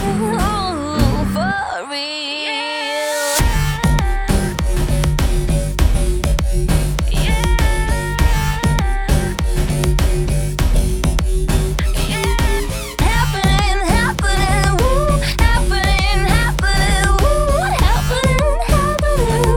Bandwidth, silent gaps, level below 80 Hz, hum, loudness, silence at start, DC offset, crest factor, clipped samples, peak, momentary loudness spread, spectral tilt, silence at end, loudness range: 18.5 kHz; none; -18 dBFS; none; -17 LUFS; 0 s; under 0.1%; 14 dB; under 0.1%; 0 dBFS; 4 LU; -5 dB/octave; 0 s; 3 LU